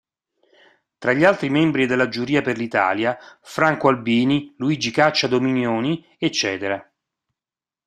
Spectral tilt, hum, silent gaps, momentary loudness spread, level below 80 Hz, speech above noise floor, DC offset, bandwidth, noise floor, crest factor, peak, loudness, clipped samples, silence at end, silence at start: -5 dB/octave; none; none; 8 LU; -60 dBFS; over 70 dB; under 0.1%; 12.5 kHz; under -90 dBFS; 20 dB; 0 dBFS; -20 LUFS; under 0.1%; 1.05 s; 1 s